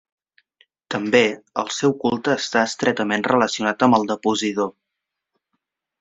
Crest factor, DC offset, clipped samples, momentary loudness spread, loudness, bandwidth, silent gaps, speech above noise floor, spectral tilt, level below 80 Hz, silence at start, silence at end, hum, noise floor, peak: 22 dB; under 0.1%; under 0.1%; 9 LU; -20 LUFS; 8 kHz; none; 62 dB; -4 dB/octave; -64 dBFS; 0.9 s; 1.3 s; none; -82 dBFS; 0 dBFS